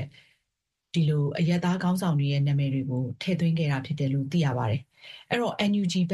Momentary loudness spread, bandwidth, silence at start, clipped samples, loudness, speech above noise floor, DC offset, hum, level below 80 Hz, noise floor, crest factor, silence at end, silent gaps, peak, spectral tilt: 6 LU; 12.5 kHz; 0 s; under 0.1%; -27 LUFS; 58 dB; under 0.1%; none; -62 dBFS; -83 dBFS; 14 dB; 0 s; none; -12 dBFS; -7 dB/octave